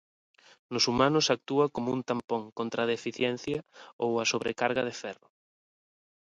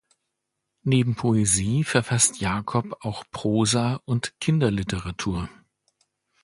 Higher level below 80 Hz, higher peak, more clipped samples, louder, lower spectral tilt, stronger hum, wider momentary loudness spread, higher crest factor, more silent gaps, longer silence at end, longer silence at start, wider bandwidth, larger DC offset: second, -64 dBFS vs -46 dBFS; second, -8 dBFS vs -2 dBFS; neither; second, -29 LUFS vs -24 LUFS; about the same, -4 dB/octave vs -4.5 dB/octave; neither; about the same, 12 LU vs 12 LU; about the same, 22 dB vs 22 dB; first, 2.24-2.28 s, 2.52-2.56 s, 3.93-3.99 s vs none; first, 1.15 s vs 0.95 s; second, 0.7 s vs 0.85 s; about the same, 11 kHz vs 11.5 kHz; neither